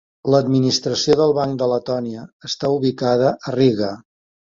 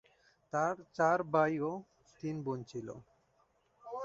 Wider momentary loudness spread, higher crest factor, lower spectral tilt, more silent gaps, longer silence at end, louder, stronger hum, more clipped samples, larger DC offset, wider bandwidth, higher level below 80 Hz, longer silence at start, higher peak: second, 11 LU vs 16 LU; about the same, 16 dB vs 20 dB; about the same, -5.5 dB/octave vs -6 dB/octave; first, 2.33-2.40 s vs none; first, 0.4 s vs 0 s; first, -18 LUFS vs -35 LUFS; neither; neither; neither; about the same, 7.6 kHz vs 7.8 kHz; first, -56 dBFS vs -74 dBFS; second, 0.25 s vs 0.55 s; first, -2 dBFS vs -16 dBFS